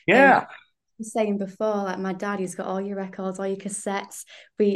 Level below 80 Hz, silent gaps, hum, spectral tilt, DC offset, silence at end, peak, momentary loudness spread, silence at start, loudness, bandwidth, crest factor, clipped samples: -70 dBFS; none; none; -5 dB/octave; under 0.1%; 0 s; -4 dBFS; 20 LU; 0.1 s; -24 LUFS; 12.5 kHz; 20 dB; under 0.1%